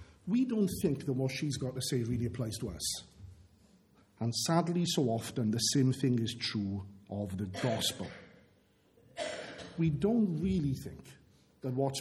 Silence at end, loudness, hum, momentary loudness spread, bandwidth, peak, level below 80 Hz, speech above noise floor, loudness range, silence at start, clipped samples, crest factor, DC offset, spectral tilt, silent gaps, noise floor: 0 s; -33 LUFS; none; 13 LU; 16.5 kHz; -14 dBFS; -58 dBFS; 35 dB; 5 LU; 0 s; under 0.1%; 20 dB; under 0.1%; -5 dB/octave; none; -67 dBFS